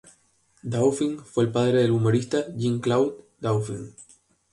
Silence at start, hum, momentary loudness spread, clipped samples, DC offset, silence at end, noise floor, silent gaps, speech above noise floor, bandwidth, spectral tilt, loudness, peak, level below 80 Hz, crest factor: 0.65 s; none; 12 LU; under 0.1%; under 0.1%; 0.5 s; -64 dBFS; none; 40 dB; 11.5 kHz; -6.5 dB/octave; -24 LUFS; -10 dBFS; -60 dBFS; 16 dB